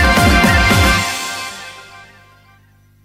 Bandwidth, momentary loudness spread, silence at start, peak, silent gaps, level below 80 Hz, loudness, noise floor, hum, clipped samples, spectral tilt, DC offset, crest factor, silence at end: 16 kHz; 18 LU; 0 s; 0 dBFS; none; -24 dBFS; -12 LUFS; -50 dBFS; 50 Hz at -40 dBFS; under 0.1%; -4 dB/octave; under 0.1%; 14 dB; 1.05 s